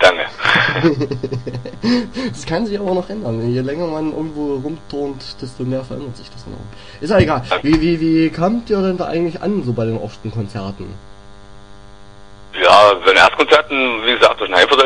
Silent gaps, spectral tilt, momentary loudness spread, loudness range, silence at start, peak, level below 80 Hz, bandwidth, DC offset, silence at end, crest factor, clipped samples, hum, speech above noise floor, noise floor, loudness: none; -5.5 dB/octave; 19 LU; 10 LU; 0 s; 0 dBFS; -40 dBFS; 10.5 kHz; 1%; 0 s; 16 dB; under 0.1%; 50 Hz at -45 dBFS; 24 dB; -40 dBFS; -15 LUFS